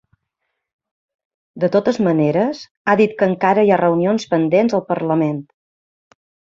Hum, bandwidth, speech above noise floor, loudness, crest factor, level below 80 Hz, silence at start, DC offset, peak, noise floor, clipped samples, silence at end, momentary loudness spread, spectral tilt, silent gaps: none; 7.6 kHz; 60 dB; -17 LUFS; 16 dB; -62 dBFS; 1.55 s; under 0.1%; -2 dBFS; -76 dBFS; under 0.1%; 1.15 s; 8 LU; -7.5 dB/octave; 2.71-2.85 s